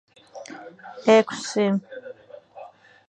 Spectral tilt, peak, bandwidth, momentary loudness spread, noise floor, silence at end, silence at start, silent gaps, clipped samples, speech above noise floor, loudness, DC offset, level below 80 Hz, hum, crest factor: -5 dB/octave; -4 dBFS; 9.4 kHz; 26 LU; -45 dBFS; 0.4 s; 0.35 s; none; under 0.1%; 23 dB; -21 LUFS; under 0.1%; -76 dBFS; none; 22 dB